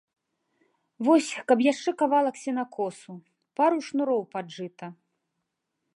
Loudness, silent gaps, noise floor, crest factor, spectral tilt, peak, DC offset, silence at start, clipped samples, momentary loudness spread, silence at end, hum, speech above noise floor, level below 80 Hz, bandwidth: -26 LUFS; none; -81 dBFS; 20 dB; -4.5 dB/octave; -8 dBFS; under 0.1%; 1 s; under 0.1%; 17 LU; 1.05 s; none; 56 dB; -84 dBFS; 11.5 kHz